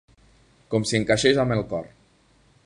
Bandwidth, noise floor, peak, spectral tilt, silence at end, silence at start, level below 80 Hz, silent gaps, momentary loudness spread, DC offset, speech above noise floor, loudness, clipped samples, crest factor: 11.5 kHz; -60 dBFS; -4 dBFS; -4.5 dB/octave; 0.8 s; 0.7 s; -50 dBFS; none; 11 LU; under 0.1%; 38 dB; -23 LUFS; under 0.1%; 20 dB